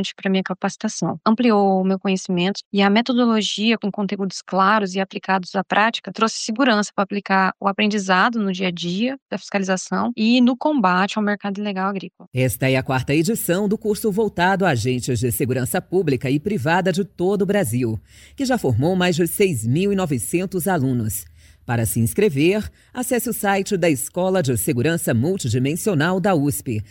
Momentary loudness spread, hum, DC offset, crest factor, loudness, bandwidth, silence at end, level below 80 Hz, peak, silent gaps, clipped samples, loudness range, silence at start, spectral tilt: 7 LU; none; under 0.1%; 16 dB; -20 LUFS; 17 kHz; 0.05 s; -50 dBFS; -4 dBFS; 2.65-2.71 s, 9.22-9.26 s, 12.27-12.31 s; under 0.1%; 2 LU; 0 s; -5 dB/octave